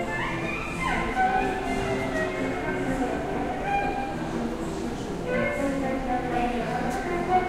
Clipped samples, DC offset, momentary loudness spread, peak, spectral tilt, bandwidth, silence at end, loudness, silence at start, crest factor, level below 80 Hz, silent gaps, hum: under 0.1%; under 0.1%; 5 LU; -12 dBFS; -5.5 dB/octave; 16 kHz; 0 s; -28 LUFS; 0 s; 16 dB; -40 dBFS; none; none